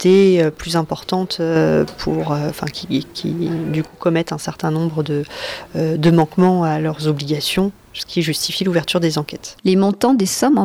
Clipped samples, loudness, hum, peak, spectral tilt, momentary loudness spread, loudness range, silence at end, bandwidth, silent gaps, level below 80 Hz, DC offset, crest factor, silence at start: under 0.1%; -18 LUFS; none; -4 dBFS; -5.5 dB/octave; 9 LU; 4 LU; 0 s; 16.5 kHz; none; -46 dBFS; under 0.1%; 14 dB; 0 s